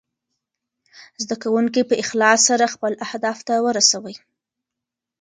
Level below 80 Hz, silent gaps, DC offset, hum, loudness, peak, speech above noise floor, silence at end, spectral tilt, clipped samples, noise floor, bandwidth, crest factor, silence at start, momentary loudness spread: -70 dBFS; none; under 0.1%; none; -18 LUFS; 0 dBFS; 66 dB; 1.05 s; -1.5 dB/octave; under 0.1%; -85 dBFS; 10.5 kHz; 20 dB; 0.95 s; 11 LU